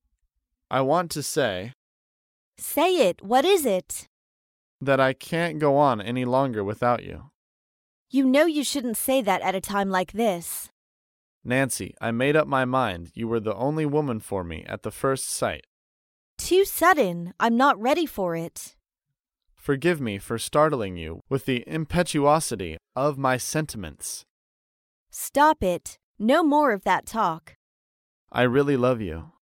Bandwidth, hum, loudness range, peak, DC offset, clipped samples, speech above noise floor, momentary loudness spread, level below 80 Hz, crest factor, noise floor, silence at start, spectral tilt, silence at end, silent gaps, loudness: 17 kHz; none; 3 LU; -6 dBFS; under 0.1%; under 0.1%; 61 dB; 14 LU; -54 dBFS; 18 dB; -85 dBFS; 0.7 s; -4.5 dB/octave; 0.3 s; 1.74-2.53 s, 4.07-4.79 s, 7.34-8.06 s, 10.71-11.41 s, 15.67-16.37 s, 24.29-25.06 s, 26.03-26.15 s, 27.55-28.27 s; -24 LUFS